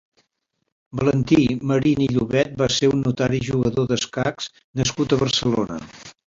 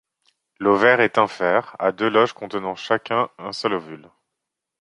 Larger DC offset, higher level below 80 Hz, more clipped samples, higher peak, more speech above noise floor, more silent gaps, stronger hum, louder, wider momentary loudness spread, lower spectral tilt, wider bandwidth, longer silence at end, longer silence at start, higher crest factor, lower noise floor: neither; first, -48 dBFS vs -66 dBFS; neither; about the same, -4 dBFS vs -2 dBFS; second, 54 dB vs 62 dB; first, 4.64-4.74 s vs none; neither; about the same, -21 LUFS vs -20 LUFS; about the same, 10 LU vs 12 LU; about the same, -5.5 dB/octave vs -5.5 dB/octave; second, 7.8 kHz vs 11 kHz; second, 0.3 s vs 0.85 s; first, 0.95 s vs 0.6 s; about the same, 18 dB vs 20 dB; second, -75 dBFS vs -82 dBFS